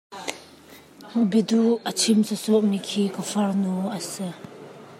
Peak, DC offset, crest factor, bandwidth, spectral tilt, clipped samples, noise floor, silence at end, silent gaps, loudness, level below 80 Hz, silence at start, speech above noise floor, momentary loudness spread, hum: -6 dBFS; under 0.1%; 18 dB; 15.5 kHz; -5 dB/octave; under 0.1%; -48 dBFS; 0 s; none; -23 LUFS; -72 dBFS; 0.1 s; 26 dB; 14 LU; none